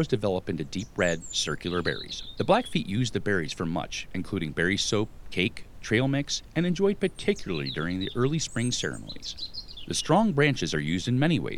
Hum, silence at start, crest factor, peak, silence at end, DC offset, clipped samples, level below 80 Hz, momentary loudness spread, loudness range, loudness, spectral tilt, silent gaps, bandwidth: none; 0 s; 20 dB; -8 dBFS; 0 s; under 0.1%; under 0.1%; -48 dBFS; 9 LU; 2 LU; -28 LUFS; -4.5 dB/octave; none; 15 kHz